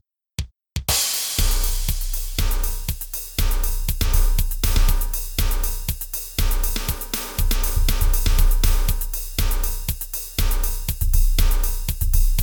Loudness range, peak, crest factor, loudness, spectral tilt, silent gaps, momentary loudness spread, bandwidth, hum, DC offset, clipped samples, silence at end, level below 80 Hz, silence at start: 1 LU; -4 dBFS; 14 dB; -23 LUFS; -3 dB/octave; none; 6 LU; over 20 kHz; none; under 0.1%; under 0.1%; 0 s; -20 dBFS; 0.4 s